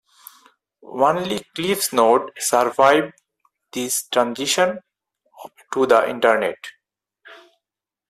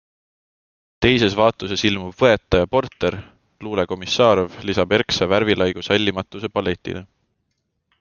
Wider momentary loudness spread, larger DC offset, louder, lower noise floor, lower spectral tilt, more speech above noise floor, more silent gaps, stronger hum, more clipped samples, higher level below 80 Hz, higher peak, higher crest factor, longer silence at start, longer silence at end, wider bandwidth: first, 16 LU vs 11 LU; neither; about the same, -19 LUFS vs -19 LUFS; first, -87 dBFS vs -73 dBFS; second, -2.5 dB/octave vs -5 dB/octave; first, 68 dB vs 54 dB; neither; neither; neither; second, -66 dBFS vs -46 dBFS; about the same, -2 dBFS vs 0 dBFS; about the same, 20 dB vs 20 dB; second, 0.85 s vs 1 s; second, 0.75 s vs 0.95 s; first, 15.5 kHz vs 7.2 kHz